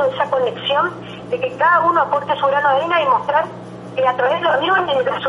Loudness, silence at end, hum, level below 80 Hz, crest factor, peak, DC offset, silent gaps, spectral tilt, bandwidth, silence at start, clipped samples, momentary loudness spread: -17 LUFS; 0 s; none; -58 dBFS; 14 dB; -4 dBFS; under 0.1%; none; -5.5 dB/octave; 10.5 kHz; 0 s; under 0.1%; 9 LU